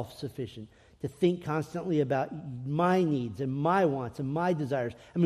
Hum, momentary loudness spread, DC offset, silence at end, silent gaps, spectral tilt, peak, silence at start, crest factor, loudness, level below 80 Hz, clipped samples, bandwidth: none; 13 LU; under 0.1%; 0 s; none; -8 dB/octave; -14 dBFS; 0 s; 16 dB; -30 LUFS; -64 dBFS; under 0.1%; 13.5 kHz